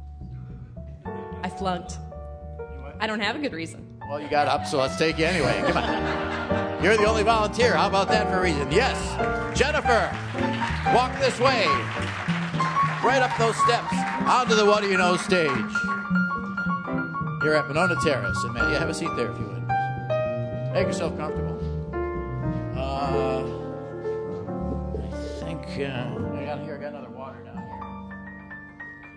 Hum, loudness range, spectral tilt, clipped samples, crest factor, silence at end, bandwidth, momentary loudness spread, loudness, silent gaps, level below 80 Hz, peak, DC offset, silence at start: none; 9 LU; -5 dB/octave; under 0.1%; 20 dB; 0 s; 11 kHz; 17 LU; -24 LUFS; none; -42 dBFS; -6 dBFS; under 0.1%; 0 s